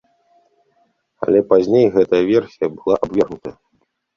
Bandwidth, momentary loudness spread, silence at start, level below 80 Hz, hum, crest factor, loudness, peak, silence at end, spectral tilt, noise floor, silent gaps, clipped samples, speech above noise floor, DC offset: 6.8 kHz; 11 LU; 1.2 s; -54 dBFS; none; 16 dB; -16 LUFS; -2 dBFS; 0.65 s; -7.5 dB/octave; -66 dBFS; none; under 0.1%; 50 dB; under 0.1%